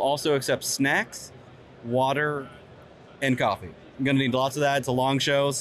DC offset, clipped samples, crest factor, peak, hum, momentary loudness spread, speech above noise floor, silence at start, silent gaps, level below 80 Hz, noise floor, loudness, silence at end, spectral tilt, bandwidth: under 0.1%; under 0.1%; 14 dB; -12 dBFS; none; 14 LU; 24 dB; 0 s; none; -62 dBFS; -48 dBFS; -25 LUFS; 0 s; -4 dB/octave; 14 kHz